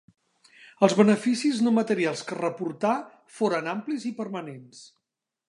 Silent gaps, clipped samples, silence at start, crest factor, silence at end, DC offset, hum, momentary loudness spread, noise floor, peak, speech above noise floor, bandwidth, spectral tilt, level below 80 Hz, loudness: none; under 0.1%; 0.8 s; 22 dB; 0.65 s; under 0.1%; none; 14 LU; -85 dBFS; -4 dBFS; 60 dB; 11 kHz; -5.5 dB/octave; -78 dBFS; -25 LUFS